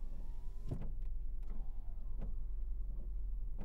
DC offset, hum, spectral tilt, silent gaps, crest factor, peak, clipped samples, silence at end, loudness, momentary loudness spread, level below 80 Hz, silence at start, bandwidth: under 0.1%; none; -9 dB/octave; none; 8 dB; -30 dBFS; under 0.1%; 0 s; -48 LUFS; 4 LU; -40 dBFS; 0 s; 1.5 kHz